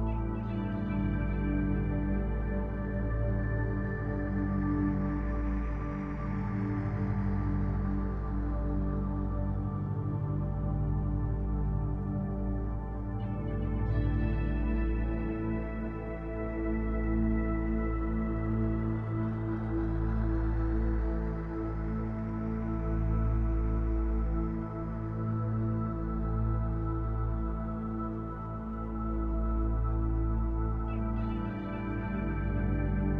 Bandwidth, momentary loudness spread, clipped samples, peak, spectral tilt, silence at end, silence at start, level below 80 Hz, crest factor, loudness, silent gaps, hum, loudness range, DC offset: 3.5 kHz; 5 LU; under 0.1%; -18 dBFS; -11 dB/octave; 0 s; 0 s; -34 dBFS; 12 dB; -33 LUFS; none; none; 1 LU; under 0.1%